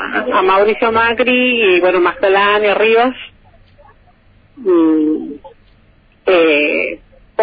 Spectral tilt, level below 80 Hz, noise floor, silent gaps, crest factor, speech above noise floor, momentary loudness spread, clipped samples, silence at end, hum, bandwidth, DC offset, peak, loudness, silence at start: -7 dB/octave; -48 dBFS; -49 dBFS; none; 14 dB; 37 dB; 12 LU; under 0.1%; 0 s; none; 5 kHz; under 0.1%; 0 dBFS; -12 LUFS; 0 s